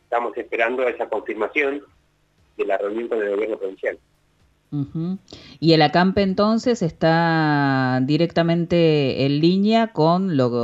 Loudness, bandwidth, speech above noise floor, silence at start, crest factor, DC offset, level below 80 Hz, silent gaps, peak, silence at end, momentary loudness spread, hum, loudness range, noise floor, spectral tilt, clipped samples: -20 LUFS; 8 kHz; 42 dB; 0.1 s; 18 dB; under 0.1%; -54 dBFS; none; -2 dBFS; 0 s; 11 LU; none; 8 LU; -61 dBFS; -7 dB/octave; under 0.1%